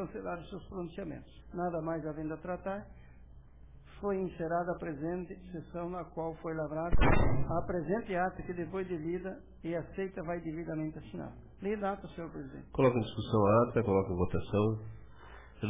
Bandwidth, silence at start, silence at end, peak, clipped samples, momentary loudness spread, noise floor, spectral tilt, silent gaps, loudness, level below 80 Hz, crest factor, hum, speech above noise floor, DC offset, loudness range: 3.8 kHz; 0 s; 0 s; -16 dBFS; under 0.1%; 15 LU; -55 dBFS; -7 dB/octave; none; -35 LUFS; -44 dBFS; 18 dB; none; 22 dB; under 0.1%; 8 LU